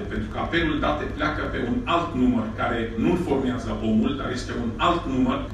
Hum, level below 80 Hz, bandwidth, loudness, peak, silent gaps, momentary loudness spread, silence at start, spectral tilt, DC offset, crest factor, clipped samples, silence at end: none; -36 dBFS; 10 kHz; -24 LUFS; -8 dBFS; none; 6 LU; 0 s; -6.5 dB/octave; under 0.1%; 16 dB; under 0.1%; 0 s